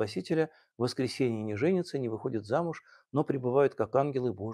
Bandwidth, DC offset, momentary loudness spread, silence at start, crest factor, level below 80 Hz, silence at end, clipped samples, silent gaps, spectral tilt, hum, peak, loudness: 12.5 kHz; under 0.1%; 8 LU; 0 s; 18 dB; -72 dBFS; 0 s; under 0.1%; none; -7 dB/octave; none; -12 dBFS; -31 LUFS